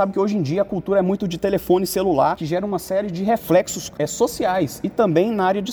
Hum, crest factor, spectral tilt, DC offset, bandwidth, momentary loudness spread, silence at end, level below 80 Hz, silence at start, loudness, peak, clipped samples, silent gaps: none; 16 dB; -5.5 dB/octave; under 0.1%; over 20 kHz; 6 LU; 0 s; -50 dBFS; 0 s; -20 LUFS; -4 dBFS; under 0.1%; none